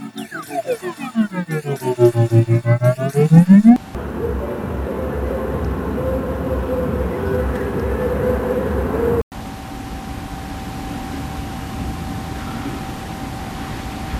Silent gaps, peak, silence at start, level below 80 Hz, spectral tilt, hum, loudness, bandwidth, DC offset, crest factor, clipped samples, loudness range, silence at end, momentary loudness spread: 9.23-9.31 s; 0 dBFS; 0 s; -30 dBFS; -8 dB/octave; none; -19 LUFS; 15 kHz; under 0.1%; 18 dB; under 0.1%; 13 LU; 0 s; 15 LU